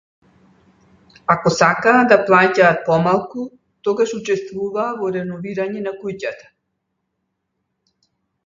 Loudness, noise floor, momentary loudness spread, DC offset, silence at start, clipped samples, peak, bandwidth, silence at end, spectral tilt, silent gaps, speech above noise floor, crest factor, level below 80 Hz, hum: -17 LUFS; -74 dBFS; 15 LU; under 0.1%; 1.3 s; under 0.1%; 0 dBFS; 7.6 kHz; 2.1 s; -5.5 dB/octave; none; 57 dB; 20 dB; -58 dBFS; none